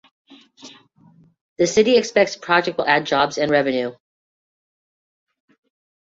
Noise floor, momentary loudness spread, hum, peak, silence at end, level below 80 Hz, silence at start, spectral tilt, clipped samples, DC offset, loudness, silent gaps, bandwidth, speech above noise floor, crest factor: -53 dBFS; 7 LU; none; -2 dBFS; 2.1 s; -62 dBFS; 0.65 s; -3.5 dB/octave; under 0.1%; under 0.1%; -18 LUFS; 1.41-1.56 s; 7.8 kHz; 35 dB; 20 dB